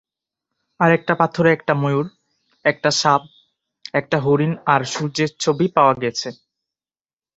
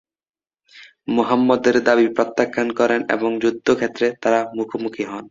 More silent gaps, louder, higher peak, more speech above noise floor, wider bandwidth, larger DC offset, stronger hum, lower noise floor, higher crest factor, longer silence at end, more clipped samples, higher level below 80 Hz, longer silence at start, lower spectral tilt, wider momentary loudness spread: neither; about the same, -19 LUFS vs -19 LUFS; about the same, 0 dBFS vs -2 dBFS; first, over 72 dB vs 31 dB; about the same, 8.2 kHz vs 7.6 kHz; neither; neither; first, under -90 dBFS vs -50 dBFS; about the same, 20 dB vs 18 dB; first, 1.05 s vs 0.05 s; neither; about the same, -60 dBFS vs -60 dBFS; about the same, 0.8 s vs 0.75 s; about the same, -5 dB/octave vs -5 dB/octave; about the same, 8 LU vs 10 LU